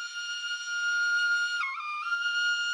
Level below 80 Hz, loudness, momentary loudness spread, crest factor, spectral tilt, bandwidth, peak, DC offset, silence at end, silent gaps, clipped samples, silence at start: under -90 dBFS; -28 LUFS; 7 LU; 10 dB; 9.5 dB/octave; 11.5 kHz; -20 dBFS; under 0.1%; 0 s; none; under 0.1%; 0 s